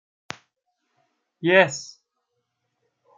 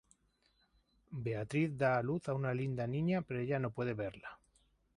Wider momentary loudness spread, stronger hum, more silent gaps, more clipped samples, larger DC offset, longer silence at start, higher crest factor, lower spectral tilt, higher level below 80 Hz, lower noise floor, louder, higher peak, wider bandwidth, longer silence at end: first, 22 LU vs 11 LU; neither; neither; neither; neither; first, 1.4 s vs 1.1 s; first, 24 dB vs 18 dB; second, -4 dB/octave vs -8 dB/octave; second, -78 dBFS vs -68 dBFS; about the same, -77 dBFS vs -75 dBFS; first, -20 LUFS vs -37 LUFS; first, -2 dBFS vs -20 dBFS; second, 9 kHz vs 11 kHz; first, 1.3 s vs 0.6 s